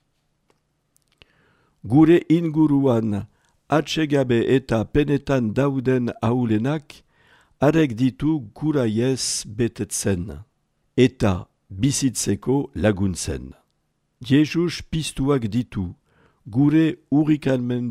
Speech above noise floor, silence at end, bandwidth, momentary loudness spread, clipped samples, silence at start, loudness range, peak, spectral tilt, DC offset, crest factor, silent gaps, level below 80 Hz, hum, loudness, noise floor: 50 dB; 0 s; 14.5 kHz; 10 LU; under 0.1%; 1.85 s; 3 LU; -4 dBFS; -6 dB/octave; under 0.1%; 18 dB; none; -46 dBFS; none; -21 LUFS; -70 dBFS